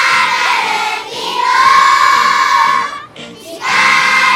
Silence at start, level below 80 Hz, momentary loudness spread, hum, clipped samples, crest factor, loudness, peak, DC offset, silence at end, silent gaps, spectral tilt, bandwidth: 0 s; -54 dBFS; 15 LU; none; under 0.1%; 12 dB; -10 LUFS; 0 dBFS; under 0.1%; 0 s; none; 0 dB/octave; 16.5 kHz